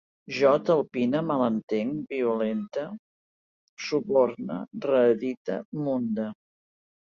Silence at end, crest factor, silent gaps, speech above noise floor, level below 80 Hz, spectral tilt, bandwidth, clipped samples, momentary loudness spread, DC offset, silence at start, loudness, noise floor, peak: 0.85 s; 18 dB; 1.63-1.68 s, 2.99-3.77 s, 5.37-5.45 s, 5.65-5.72 s; over 64 dB; -70 dBFS; -7 dB/octave; 7.2 kHz; under 0.1%; 12 LU; under 0.1%; 0.3 s; -26 LUFS; under -90 dBFS; -10 dBFS